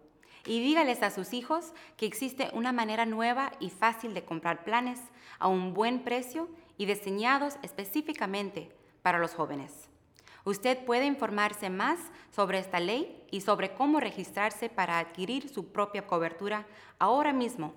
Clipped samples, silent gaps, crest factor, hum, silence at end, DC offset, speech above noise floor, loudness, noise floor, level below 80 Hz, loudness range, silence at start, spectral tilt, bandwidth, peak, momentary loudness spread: under 0.1%; none; 20 dB; none; 0 s; under 0.1%; 27 dB; -31 LUFS; -58 dBFS; -74 dBFS; 2 LU; 0.35 s; -4.5 dB/octave; 19.5 kHz; -10 dBFS; 10 LU